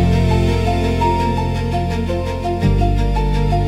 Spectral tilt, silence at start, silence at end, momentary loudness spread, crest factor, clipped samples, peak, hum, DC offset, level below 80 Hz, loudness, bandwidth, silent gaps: -7.5 dB/octave; 0 s; 0 s; 5 LU; 12 dB; under 0.1%; -4 dBFS; none; under 0.1%; -22 dBFS; -18 LUFS; 12.5 kHz; none